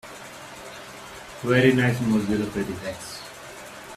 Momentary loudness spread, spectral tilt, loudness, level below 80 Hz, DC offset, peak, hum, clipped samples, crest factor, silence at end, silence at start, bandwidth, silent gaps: 20 LU; -6 dB/octave; -23 LUFS; -54 dBFS; under 0.1%; -4 dBFS; none; under 0.1%; 22 dB; 0 s; 0.05 s; 14.5 kHz; none